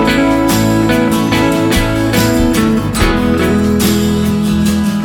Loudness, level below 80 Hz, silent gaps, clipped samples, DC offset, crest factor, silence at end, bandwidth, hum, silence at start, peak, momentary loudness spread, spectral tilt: -12 LUFS; -24 dBFS; none; under 0.1%; under 0.1%; 12 dB; 0 s; 18.5 kHz; none; 0 s; 0 dBFS; 2 LU; -5.5 dB/octave